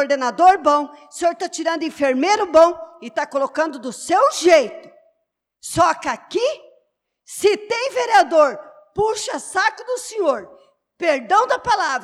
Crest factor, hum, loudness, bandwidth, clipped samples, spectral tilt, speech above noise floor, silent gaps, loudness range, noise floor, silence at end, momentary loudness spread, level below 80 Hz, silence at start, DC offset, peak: 16 dB; none; -18 LUFS; 14 kHz; under 0.1%; -3 dB/octave; 56 dB; none; 3 LU; -74 dBFS; 0 s; 13 LU; -58 dBFS; 0 s; under 0.1%; -4 dBFS